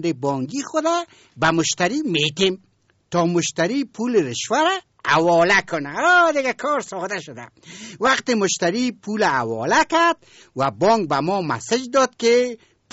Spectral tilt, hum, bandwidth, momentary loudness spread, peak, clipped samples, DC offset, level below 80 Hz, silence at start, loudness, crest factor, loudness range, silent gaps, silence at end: -3 dB/octave; none; 8 kHz; 11 LU; -6 dBFS; under 0.1%; under 0.1%; -58 dBFS; 0 s; -20 LUFS; 14 dB; 3 LU; none; 0.35 s